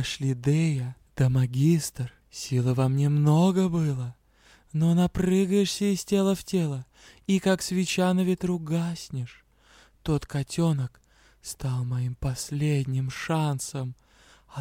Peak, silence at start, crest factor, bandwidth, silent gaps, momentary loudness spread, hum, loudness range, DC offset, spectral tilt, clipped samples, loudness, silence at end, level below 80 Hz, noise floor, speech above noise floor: -10 dBFS; 0 s; 16 dB; 16.5 kHz; none; 14 LU; none; 6 LU; under 0.1%; -6.5 dB/octave; under 0.1%; -26 LUFS; 0 s; -52 dBFS; -58 dBFS; 33 dB